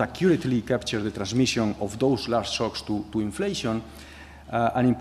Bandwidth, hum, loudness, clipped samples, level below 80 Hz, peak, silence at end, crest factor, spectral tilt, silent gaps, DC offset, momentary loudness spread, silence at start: 13.5 kHz; none; -26 LUFS; under 0.1%; -50 dBFS; -8 dBFS; 0 s; 16 dB; -5.5 dB/octave; none; under 0.1%; 9 LU; 0 s